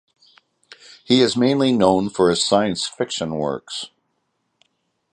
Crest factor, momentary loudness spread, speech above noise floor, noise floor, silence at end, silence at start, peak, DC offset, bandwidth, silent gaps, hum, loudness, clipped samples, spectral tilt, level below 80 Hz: 20 dB; 12 LU; 53 dB; -72 dBFS; 1.25 s; 1.1 s; -2 dBFS; under 0.1%; 10 kHz; none; none; -19 LUFS; under 0.1%; -4.5 dB/octave; -56 dBFS